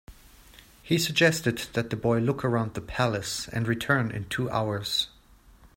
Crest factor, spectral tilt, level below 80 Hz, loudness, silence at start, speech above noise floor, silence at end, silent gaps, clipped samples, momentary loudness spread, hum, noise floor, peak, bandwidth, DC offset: 22 dB; -4.5 dB/octave; -52 dBFS; -27 LUFS; 0.1 s; 29 dB; 0.1 s; none; under 0.1%; 8 LU; none; -55 dBFS; -6 dBFS; 16.5 kHz; under 0.1%